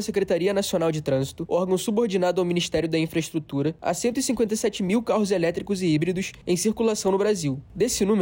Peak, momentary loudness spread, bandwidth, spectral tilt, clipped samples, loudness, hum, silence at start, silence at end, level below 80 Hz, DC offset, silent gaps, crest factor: -12 dBFS; 4 LU; 16.5 kHz; -5 dB/octave; under 0.1%; -24 LUFS; none; 0 s; 0 s; -52 dBFS; under 0.1%; none; 12 dB